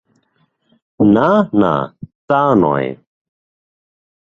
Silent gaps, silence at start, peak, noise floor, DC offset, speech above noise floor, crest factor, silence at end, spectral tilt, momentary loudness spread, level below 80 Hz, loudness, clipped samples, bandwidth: 2.15-2.28 s; 1 s; 0 dBFS; -62 dBFS; under 0.1%; 49 dB; 16 dB; 1.35 s; -9 dB/octave; 8 LU; -50 dBFS; -14 LUFS; under 0.1%; 6.6 kHz